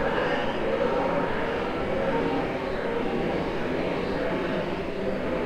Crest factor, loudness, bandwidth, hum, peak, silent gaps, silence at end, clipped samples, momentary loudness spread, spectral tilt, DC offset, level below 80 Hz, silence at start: 14 dB; -27 LUFS; 15 kHz; none; -14 dBFS; none; 0 s; under 0.1%; 4 LU; -6.5 dB/octave; under 0.1%; -42 dBFS; 0 s